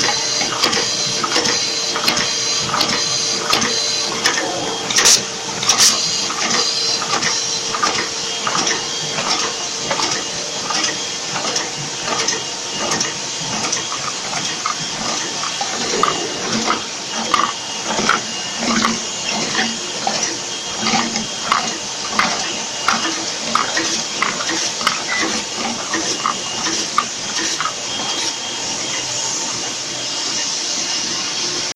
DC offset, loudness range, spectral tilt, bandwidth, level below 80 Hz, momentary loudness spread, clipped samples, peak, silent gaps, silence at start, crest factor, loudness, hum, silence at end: under 0.1%; 5 LU; -0.5 dB/octave; 16 kHz; -54 dBFS; 6 LU; under 0.1%; 0 dBFS; none; 0 s; 20 dB; -17 LUFS; none; 0.05 s